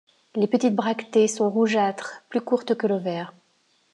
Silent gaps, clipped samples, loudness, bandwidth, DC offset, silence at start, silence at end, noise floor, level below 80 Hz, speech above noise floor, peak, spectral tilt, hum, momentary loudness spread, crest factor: none; under 0.1%; -24 LUFS; 11 kHz; under 0.1%; 0.35 s; 0.65 s; -65 dBFS; -82 dBFS; 42 dB; -8 dBFS; -5 dB/octave; none; 12 LU; 16 dB